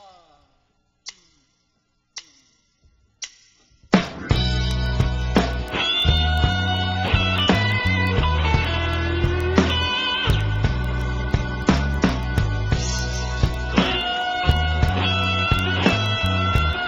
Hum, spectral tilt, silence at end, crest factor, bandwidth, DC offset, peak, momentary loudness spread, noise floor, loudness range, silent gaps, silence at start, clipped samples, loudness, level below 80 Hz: none; -5 dB/octave; 0 s; 20 dB; 15 kHz; under 0.1%; -2 dBFS; 6 LU; -68 dBFS; 7 LU; none; 1.05 s; under 0.1%; -21 LUFS; -28 dBFS